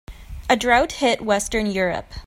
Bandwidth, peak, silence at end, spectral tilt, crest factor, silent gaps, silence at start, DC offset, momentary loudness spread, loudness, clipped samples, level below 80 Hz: 16 kHz; -2 dBFS; 0 s; -3.5 dB/octave; 20 dB; none; 0.1 s; under 0.1%; 9 LU; -20 LUFS; under 0.1%; -38 dBFS